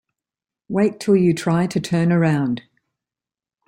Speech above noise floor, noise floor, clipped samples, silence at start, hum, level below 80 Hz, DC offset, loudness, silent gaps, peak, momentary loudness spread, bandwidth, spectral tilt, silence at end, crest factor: over 72 dB; under -90 dBFS; under 0.1%; 0.7 s; none; -58 dBFS; under 0.1%; -19 LUFS; none; -6 dBFS; 8 LU; 12.5 kHz; -7 dB/octave; 1.1 s; 16 dB